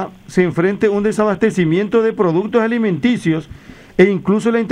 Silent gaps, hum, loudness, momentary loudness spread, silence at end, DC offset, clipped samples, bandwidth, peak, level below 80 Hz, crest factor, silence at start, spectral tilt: none; none; -16 LUFS; 4 LU; 0 s; under 0.1%; under 0.1%; 11 kHz; 0 dBFS; -48 dBFS; 14 dB; 0 s; -7 dB/octave